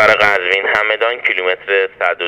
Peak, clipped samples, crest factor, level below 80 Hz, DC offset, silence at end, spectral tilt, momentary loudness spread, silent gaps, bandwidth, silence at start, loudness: 0 dBFS; under 0.1%; 14 dB; -54 dBFS; under 0.1%; 0 s; -3 dB/octave; 5 LU; none; 16.5 kHz; 0 s; -14 LUFS